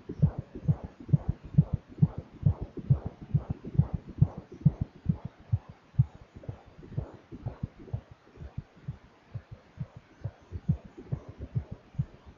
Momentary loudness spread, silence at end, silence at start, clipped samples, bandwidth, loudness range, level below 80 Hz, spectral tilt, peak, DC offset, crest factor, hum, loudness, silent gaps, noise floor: 16 LU; 0.05 s; 0.1 s; under 0.1%; 4.3 kHz; 13 LU; -44 dBFS; -11 dB/octave; -10 dBFS; under 0.1%; 22 dB; none; -32 LUFS; none; -48 dBFS